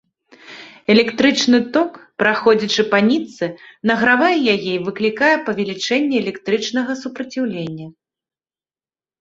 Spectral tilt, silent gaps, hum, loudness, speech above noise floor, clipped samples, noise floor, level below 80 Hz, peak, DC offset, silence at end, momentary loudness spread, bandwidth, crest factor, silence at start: -4.5 dB/octave; none; none; -17 LUFS; over 73 dB; under 0.1%; under -90 dBFS; -60 dBFS; 0 dBFS; under 0.1%; 1.3 s; 12 LU; 7.8 kHz; 18 dB; 0.45 s